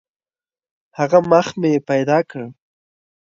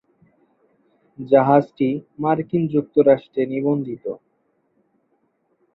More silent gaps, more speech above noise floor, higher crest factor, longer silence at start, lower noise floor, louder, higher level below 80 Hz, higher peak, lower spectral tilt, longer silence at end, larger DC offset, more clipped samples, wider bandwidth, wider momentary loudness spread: neither; first, over 74 dB vs 48 dB; about the same, 20 dB vs 20 dB; second, 1 s vs 1.2 s; first, under -90 dBFS vs -67 dBFS; about the same, -17 LUFS vs -19 LUFS; about the same, -62 dBFS vs -64 dBFS; about the same, 0 dBFS vs -2 dBFS; second, -6.5 dB/octave vs -11 dB/octave; second, 0.75 s vs 1.6 s; neither; neither; first, 7.6 kHz vs 5.2 kHz; first, 19 LU vs 15 LU